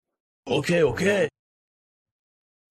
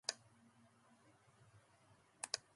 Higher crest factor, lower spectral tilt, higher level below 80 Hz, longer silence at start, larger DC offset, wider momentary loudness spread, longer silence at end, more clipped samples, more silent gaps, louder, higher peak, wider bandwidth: second, 18 dB vs 32 dB; first, -5.5 dB/octave vs 0 dB/octave; first, -56 dBFS vs -88 dBFS; first, 0.45 s vs 0.1 s; neither; second, 7 LU vs 24 LU; first, 1.45 s vs 0.15 s; neither; neither; first, -23 LUFS vs -48 LUFS; first, -8 dBFS vs -22 dBFS; first, 13 kHz vs 11.5 kHz